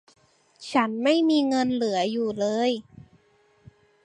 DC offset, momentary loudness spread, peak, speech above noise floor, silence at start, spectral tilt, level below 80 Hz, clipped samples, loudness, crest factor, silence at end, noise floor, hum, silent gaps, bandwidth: under 0.1%; 6 LU; -6 dBFS; 39 dB; 0.6 s; -4.5 dB/octave; -68 dBFS; under 0.1%; -24 LUFS; 20 dB; 1.25 s; -62 dBFS; none; none; 10.5 kHz